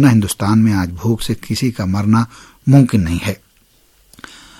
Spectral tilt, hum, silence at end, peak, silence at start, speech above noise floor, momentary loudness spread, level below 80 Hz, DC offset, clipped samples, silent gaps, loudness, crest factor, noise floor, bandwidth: -6.5 dB/octave; none; 1.25 s; 0 dBFS; 0 s; 39 dB; 11 LU; -38 dBFS; under 0.1%; under 0.1%; none; -16 LUFS; 16 dB; -53 dBFS; 16 kHz